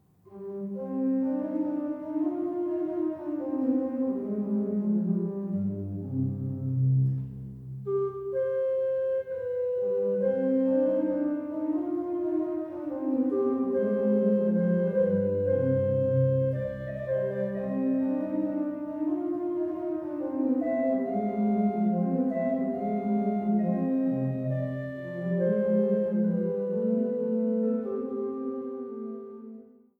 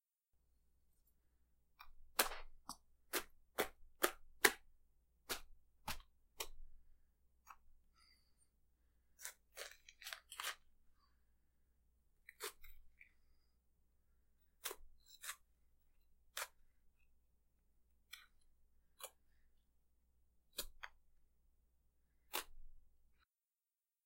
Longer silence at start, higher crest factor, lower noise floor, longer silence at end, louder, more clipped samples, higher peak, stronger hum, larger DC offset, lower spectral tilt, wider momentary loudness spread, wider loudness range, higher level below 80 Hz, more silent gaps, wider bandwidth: second, 0.3 s vs 1.8 s; second, 14 dB vs 44 dB; second, -49 dBFS vs under -90 dBFS; second, 0.35 s vs 1.2 s; first, -28 LUFS vs -45 LUFS; neither; second, -14 dBFS vs -8 dBFS; neither; neither; first, -12 dB/octave vs -0.5 dB/octave; second, 9 LU vs 25 LU; second, 4 LU vs 17 LU; about the same, -64 dBFS vs -66 dBFS; neither; second, 3.5 kHz vs 16 kHz